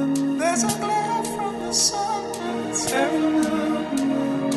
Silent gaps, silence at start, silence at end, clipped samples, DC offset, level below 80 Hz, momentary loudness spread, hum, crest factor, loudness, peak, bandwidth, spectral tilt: none; 0 s; 0 s; under 0.1%; under 0.1%; -56 dBFS; 7 LU; none; 16 dB; -23 LUFS; -8 dBFS; 12.5 kHz; -3 dB/octave